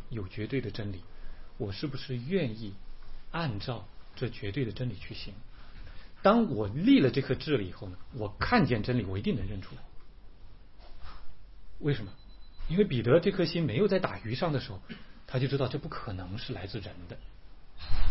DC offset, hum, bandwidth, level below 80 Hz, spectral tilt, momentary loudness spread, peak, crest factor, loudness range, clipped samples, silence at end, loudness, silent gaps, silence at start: 0.3%; none; 5.8 kHz; -42 dBFS; -10 dB/octave; 23 LU; -10 dBFS; 20 dB; 9 LU; under 0.1%; 0 s; -31 LUFS; none; 0 s